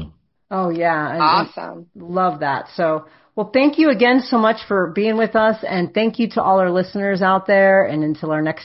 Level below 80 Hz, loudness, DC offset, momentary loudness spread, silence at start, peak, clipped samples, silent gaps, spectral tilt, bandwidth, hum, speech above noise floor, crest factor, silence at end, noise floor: -56 dBFS; -17 LUFS; under 0.1%; 12 LU; 0 s; -2 dBFS; under 0.1%; none; -9.5 dB/octave; 5.8 kHz; none; 21 dB; 16 dB; 0 s; -38 dBFS